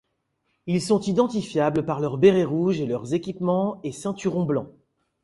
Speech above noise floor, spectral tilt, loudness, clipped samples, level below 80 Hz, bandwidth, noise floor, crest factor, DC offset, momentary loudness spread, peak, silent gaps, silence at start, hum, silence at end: 51 dB; -7 dB/octave; -24 LUFS; under 0.1%; -60 dBFS; 11.5 kHz; -74 dBFS; 20 dB; under 0.1%; 10 LU; -4 dBFS; none; 0.65 s; none; 0.55 s